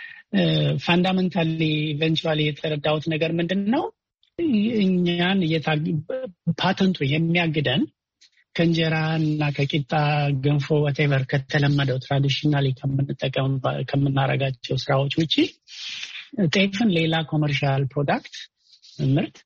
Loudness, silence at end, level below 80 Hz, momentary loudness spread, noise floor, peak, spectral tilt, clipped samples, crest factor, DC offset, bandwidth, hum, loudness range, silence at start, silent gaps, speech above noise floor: -22 LUFS; 0.15 s; -56 dBFS; 7 LU; -60 dBFS; -8 dBFS; -7 dB/octave; under 0.1%; 16 dB; under 0.1%; 7.2 kHz; none; 2 LU; 0 s; none; 38 dB